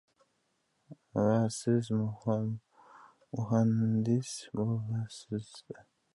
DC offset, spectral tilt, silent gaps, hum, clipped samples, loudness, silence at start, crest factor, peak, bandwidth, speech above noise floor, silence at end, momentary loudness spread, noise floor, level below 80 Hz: under 0.1%; -7 dB/octave; none; none; under 0.1%; -32 LUFS; 0.9 s; 16 dB; -16 dBFS; 11.5 kHz; 46 dB; 0.35 s; 15 LU; -77 dBFS; -68 dBFS